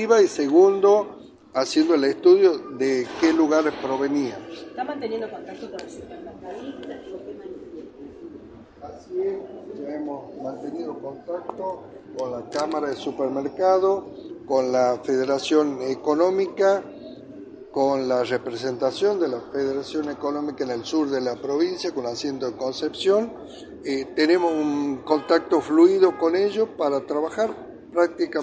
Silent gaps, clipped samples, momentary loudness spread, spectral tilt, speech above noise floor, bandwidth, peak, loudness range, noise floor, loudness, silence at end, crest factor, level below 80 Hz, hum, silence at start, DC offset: none; under 0.1%; 20 LU; -5 dB/octave; 21 dB; 9 kHz; -4 dBFS; 13 LU; -44 dBFS; -23 LUFS; 0 s; 18 dB; -64 dBFS; none; 0 s; under 0.1%